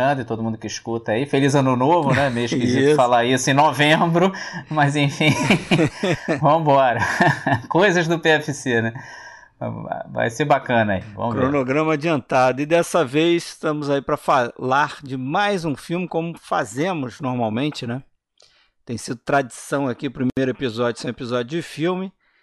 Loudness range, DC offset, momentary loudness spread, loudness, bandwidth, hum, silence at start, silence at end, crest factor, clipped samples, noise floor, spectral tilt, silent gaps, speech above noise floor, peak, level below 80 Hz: 8 LU; under 0.1%; 12 LU; -20 LUFS; 12 kHz; none; 0 s; 0.35 s; 14 dB; under 0.1%; -58 dBFS; -5.5 dB/octave; none; 38 dB; -6 dBFS; -56 dBFS